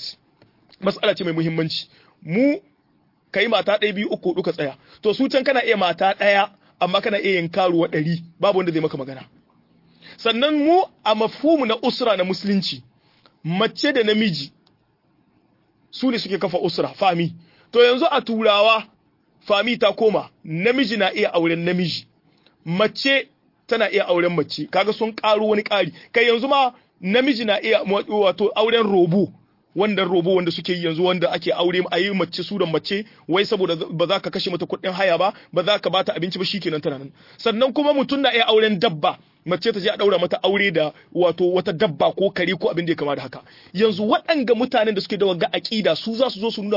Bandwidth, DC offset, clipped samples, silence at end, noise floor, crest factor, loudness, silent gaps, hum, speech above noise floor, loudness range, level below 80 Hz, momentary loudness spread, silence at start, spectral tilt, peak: 5.8 kHz; under 0.1%; under 0.1%; 0 s; -62 dBFS; 16 dB; -20 LUFS; none; none; 43 dB; 3 LU; -66 dBFS; 8 LU; 0 s; -6 dB/octave; -4 dBFS